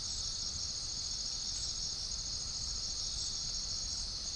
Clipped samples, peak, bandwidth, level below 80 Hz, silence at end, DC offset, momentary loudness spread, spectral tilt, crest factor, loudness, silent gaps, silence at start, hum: under 0.1%; -26 dBFS; 10.5 kHz; -50 dBFS; 0 s; under 0.1%; 1 LU; -0.5 dB/octave; 14 dB; -36 LUFS; none; 0 s; none